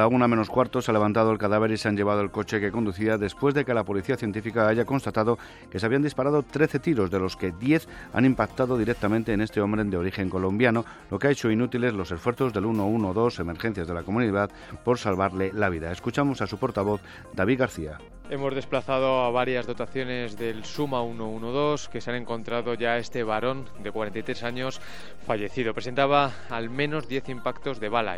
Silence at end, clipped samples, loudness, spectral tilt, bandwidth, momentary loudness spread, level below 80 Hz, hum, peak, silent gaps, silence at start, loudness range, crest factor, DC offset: 0 s; under 0.1%; -26 LUFS; -6.5 dB/octave; 15 kHz; 9 LU; -50 dBFS; none; -6 dBFS; none; 0 s; 4 LU; 20 dB; under 0.1%